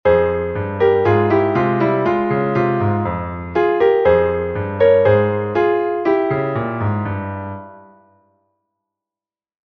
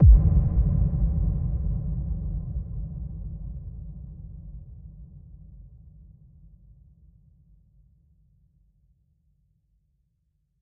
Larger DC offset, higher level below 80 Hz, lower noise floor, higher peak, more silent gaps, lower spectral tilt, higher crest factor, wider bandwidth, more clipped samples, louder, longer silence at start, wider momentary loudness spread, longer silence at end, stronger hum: neither; second, -44 dBFS vs -28 dBFS; first, under -90 dBFS vs -72 dBFS; first, -2 dBFS vs -6 dBFS; neither; second, -9.5 dB/octave vs -15.5 dB/octave; about the same, 16 dB vs 20 dB; first, 6.2 kHz vs 1.3 kHz; neither; first, -17 LUFS vs -27 LUFS; about the same, 0.05 s vs 0 s; second, 9 LU vs 25 LU; second, 1.9 s vs 4.95 s; neither